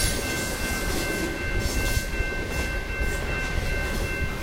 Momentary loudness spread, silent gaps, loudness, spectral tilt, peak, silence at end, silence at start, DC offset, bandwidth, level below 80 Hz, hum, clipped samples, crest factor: 2 LU; none; -27 LUFS; -3.5 dB/octave; -12 dBFS; 0 s; 0 s; under 0.1%; 16 kHz; -30 dBFS; none; under 0.1%; 16 dB